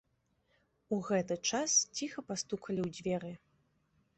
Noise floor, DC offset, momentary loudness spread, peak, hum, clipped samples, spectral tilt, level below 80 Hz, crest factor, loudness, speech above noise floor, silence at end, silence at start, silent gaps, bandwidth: -77 dBFS; under 0.1%; 11 LU; -16 dBFS; none; under 0.1%; -3 dB/octave; -72 dBFS; 20 dB; -34 LUFS; 41 dB; 0.8 s; 0.9 s; none; 8.6 kHz